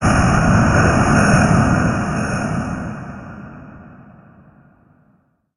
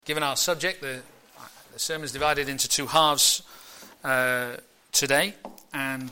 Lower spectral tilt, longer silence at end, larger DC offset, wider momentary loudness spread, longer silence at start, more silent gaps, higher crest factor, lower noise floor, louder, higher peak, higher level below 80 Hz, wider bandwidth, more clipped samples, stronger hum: first, -6 dB/octave vs -1.5 dB/octave; first, 1.7 s vs 0 s; neither; about the same, 20 LU vs 21 LU; about the same, 0 s vs 0.05 s; neither; about the same, 16 dB vs 20 dB; first, -59 dBFS vs -49 dBFS; first, -15 LUFS vs -24 LUFS; first, -2 dBFS vs -6 dBFS; first, -30 dBFS vs -58 dBFS; second, 11.5 kHz vs 17 kHz; neither; neither